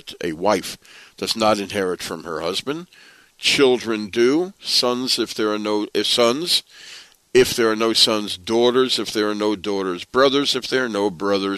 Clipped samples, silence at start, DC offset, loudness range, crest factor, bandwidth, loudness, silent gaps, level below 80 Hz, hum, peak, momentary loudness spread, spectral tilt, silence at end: under 0.1%; 0.05 s; under 0.1%; 3 LU; 18 dB; 13.5 kHz; -19 LUFS; none; -58 dBFS; none; -2 dBFS; 11 LU; -3 dB/octave; 0 s